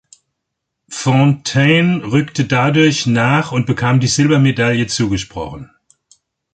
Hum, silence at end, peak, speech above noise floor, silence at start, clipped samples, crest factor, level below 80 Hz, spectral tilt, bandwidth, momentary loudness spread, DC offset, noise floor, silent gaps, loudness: none; 0.9 s; -2 dBFS; 63 dB; 0.9 s; under 0.1%; 14 dB; -44 dBFS; -5.5 dB/octave; 9.2 kHz; 10 LU; under 0.1%; -76 dBFS; none; -14 LUFS